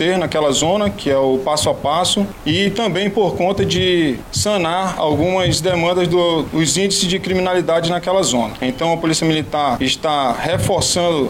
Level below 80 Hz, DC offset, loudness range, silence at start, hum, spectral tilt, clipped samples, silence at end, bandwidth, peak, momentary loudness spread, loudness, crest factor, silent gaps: -40 dBFS; under 0.1%; 1 LU; 0 s; none; -4 dB/octave; under 0.1%; 0 s; 16.5 kHz; -2 dBFS; 3 LU; -16 LUFS; 14 dB; none